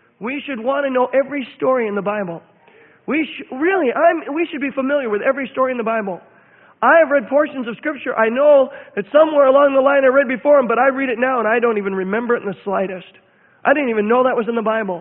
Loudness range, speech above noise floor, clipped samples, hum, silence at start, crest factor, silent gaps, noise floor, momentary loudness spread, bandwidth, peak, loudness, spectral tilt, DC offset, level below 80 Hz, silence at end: 6 LU; 33 dB; under 0.1%; none; 0.2 s; 16 dB; none; -49 dBFS; 12 LU; 3.9 kHz; 0 dBFS; -17 LUFS; -10.5 dB/octave; under 0.1%; -66 dBFS; 0 s